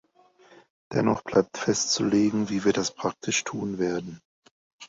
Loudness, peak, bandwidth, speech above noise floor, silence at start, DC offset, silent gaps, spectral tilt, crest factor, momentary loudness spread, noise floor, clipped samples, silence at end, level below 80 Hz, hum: -26 LUFS; -8 dBFS; 8 kHz; 33 dB; 0.9 s; under 0.1%; 4.25-4.42 s, 4.51-4.79 s; -4 dB/octave; 20 dB; 8 LU; -58 dBFS; under 0.1%; 0 s; -60 dBFS; none